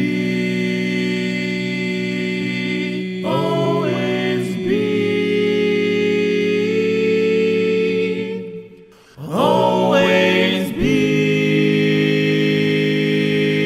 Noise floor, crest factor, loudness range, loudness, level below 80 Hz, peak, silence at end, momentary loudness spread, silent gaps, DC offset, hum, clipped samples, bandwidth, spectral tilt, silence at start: -44 dBFS; 16 dB; 5 LU; -18 LUFS; -48 dBFS; 0 dBFS; 0 s; 6 LU; none; under 0.1%; none; under 0.1%; 14.5 kHz; -6.5 dB/octave; 0 s